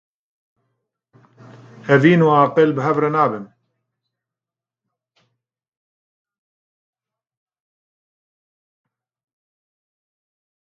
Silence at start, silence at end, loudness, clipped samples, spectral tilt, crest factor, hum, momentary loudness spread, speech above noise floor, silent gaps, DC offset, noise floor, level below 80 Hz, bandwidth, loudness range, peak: 1.85 s; 7.35 s; -15 LUFS; under 0.1%; -8 dB/octave; 22 dB; none; 10 LU; 75 dB; none; under 0.1%; -89 dBFS; -70 dBFS; 7.4 kHz; 8 LU; 0 dBFS